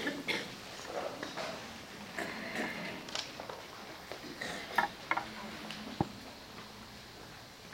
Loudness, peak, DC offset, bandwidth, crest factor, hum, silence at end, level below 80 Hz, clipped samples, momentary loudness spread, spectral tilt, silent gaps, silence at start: -40 LUFS; -14 dBFS; under 0.1%; 16 kHz; 26 dB; none; 0 s; -66 dBFS; under 0.1%; 14 LU; -3.5 dB/octave; none; 0 s